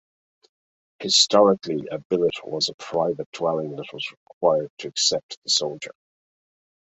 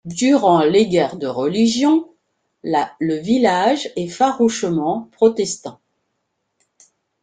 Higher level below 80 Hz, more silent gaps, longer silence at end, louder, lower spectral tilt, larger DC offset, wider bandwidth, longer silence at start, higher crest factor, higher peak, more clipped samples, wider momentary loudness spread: second, -68 dBFS vs -60 dBFS; first, 2.05-2.10 s, 2.74-2.78 s, 3.26-3.32 s, 4.17-4.26 s, 4.33-4.41 s, 4.70-4.77 s, 5.23-5.29 s, 5.37-5.42 s vs none; second, 1 s vs 1.5 s; second, -22 LUFS vs -17 LUFS; second, -2.5 dB/octave vs -5 dB/octave; neither; second, 8.4 kHz vs 9.4 kHz; first, 1 s vs 0.05 s; first, 22 dB vs 16 dB; about the same, -2 dBFS vs -2 dBFS; neither; first, 16 LU vs 9 LU